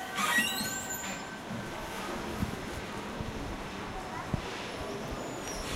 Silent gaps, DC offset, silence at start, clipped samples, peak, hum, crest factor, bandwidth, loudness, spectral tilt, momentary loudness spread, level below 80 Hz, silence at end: none; under 0.1%; 0 s; under 0.1%; -14 dBFS; none; 20 dB; 16 kHz; -35 LUFS; -3 dB/octave; 11 LU; -50 dBFS; 0 s